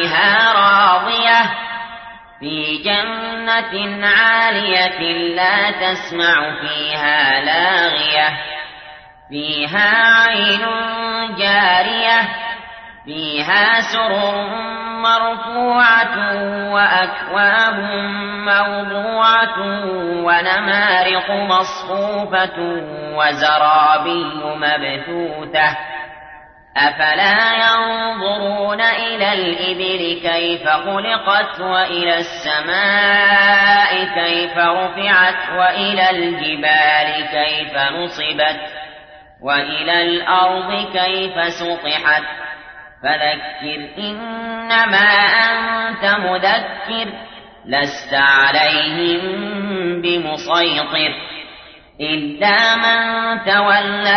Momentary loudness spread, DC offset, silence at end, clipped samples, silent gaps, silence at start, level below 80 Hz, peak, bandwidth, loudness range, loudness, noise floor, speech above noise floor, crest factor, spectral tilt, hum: 13 LU; under 0.1%; 0 s; under 0.1%; none; 0 s; -54 dBFS; -2 dBFS; 6.6 kHz; 4 LU; -15 LUFS; -41 dBFS; 25 dB; 14 dB; -4 dB/octave; none